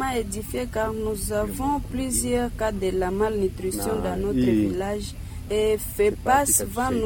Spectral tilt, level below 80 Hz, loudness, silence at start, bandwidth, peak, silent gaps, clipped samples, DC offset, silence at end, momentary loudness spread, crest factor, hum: -4.5 dB/octave; -36 dBFS; -24 LUFS; 0 s; 17.5 kHz; -8 dBFS; none; under 0.1%; under 0.1%; 0 s; 8 LU; 16 dB; none